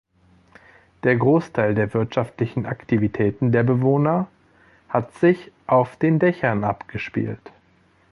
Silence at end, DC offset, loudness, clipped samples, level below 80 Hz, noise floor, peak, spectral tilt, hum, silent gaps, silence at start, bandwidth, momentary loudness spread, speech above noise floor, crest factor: 0.75 s; under 0.1%; -21 LUFS; under 0.1%; -52 dBFS; -58 dBFS; -4 dBFS; -9.5 dB/octave; none; none; 1.05 s; 11 kHz; 9 LU; 38 dB; 18 dB